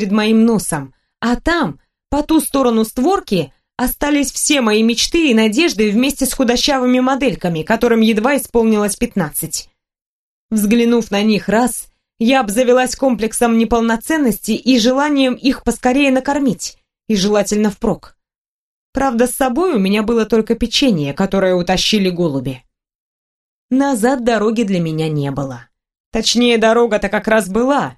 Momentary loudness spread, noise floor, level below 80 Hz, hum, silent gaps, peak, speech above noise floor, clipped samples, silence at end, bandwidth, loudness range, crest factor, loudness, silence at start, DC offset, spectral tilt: 8 LU; -79 dBFS; -38 dBFS; none; 10.06-10.49 s, 18.38-18.93 s, 22.95-23.69 s, 26.00-26.12 s; 0 dBFS; 65 dB; under 0.1%; 0.05 s; 13 kHz; 3 LU; 16 dB; -15 LUFS; 0 s; under 0.1%; -4.5 dB/octave